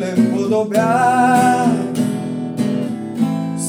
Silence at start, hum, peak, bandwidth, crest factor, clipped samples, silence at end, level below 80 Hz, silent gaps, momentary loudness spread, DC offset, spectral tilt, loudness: 0 s; none; -2 dBFS; over 20 kHz; 14 dB; under 0.1%; 0 s; -66 dBFS; none; 9 LU; under 0.1%; -6 dB/octave; -17 LUFS